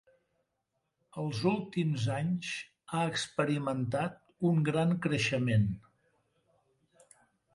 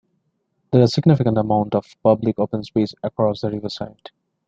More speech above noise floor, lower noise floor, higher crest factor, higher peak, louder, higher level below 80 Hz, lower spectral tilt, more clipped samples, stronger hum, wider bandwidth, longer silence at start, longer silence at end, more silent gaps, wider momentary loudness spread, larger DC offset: about the same, 51 dB vs 51 dB; first, -82 dBFS vs -70 dBFS; about the same, 18 dB vs 18 dB; second, -14 dBFS vs -2 dBFS; second, -32 LUFS vs -20 LUFS; second, -62 dBFS vs -54 dBFS; second, -6 dB/octave vs -8 dB/octave; neither; neither; first, 11.5 kHz vs 7.8 kHz; first, 1.15 s vs 0.7 s; first, 1.75 s vs 0.6 s; neither; about the same, 10 LU vs 11 LU; neither